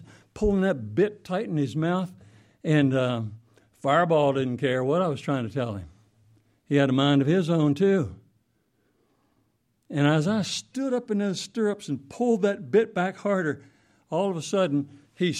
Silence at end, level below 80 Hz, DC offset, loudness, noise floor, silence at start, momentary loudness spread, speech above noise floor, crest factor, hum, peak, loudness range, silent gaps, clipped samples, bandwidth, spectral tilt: 0 s; -52 dBFS; under 0.1%; -25 LUFS; -70 dBFS; 0 s; 10 LU; 46 dB; 18 dB; none; -8 dBFS; 3 LU; none; under 0.1%; 12 kHz; -6.5 dB/octave